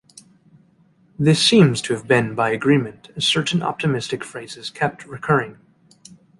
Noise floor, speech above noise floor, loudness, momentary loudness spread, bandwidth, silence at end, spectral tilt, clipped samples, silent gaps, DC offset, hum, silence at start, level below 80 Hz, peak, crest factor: -57 dBFS; 37 dB; -19 LUFS; 17 LU; 11.5 kHz; 0.9 s; -5 dB/octave; under 0.1%; none; under 0.1%; none; 1.2 s; -58 dBFS; -2 dBFS; 18 dB